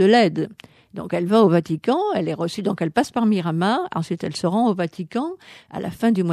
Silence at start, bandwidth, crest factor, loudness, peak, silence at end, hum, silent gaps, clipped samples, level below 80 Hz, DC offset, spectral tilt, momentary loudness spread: 0 s; 13 kHz; 16 dB; -21 LUFS; -4 dBFS; 0 s; none; none; under 0.1%; -62 dBFS; under 0.1%; -6.5 dB/octave; 14 LU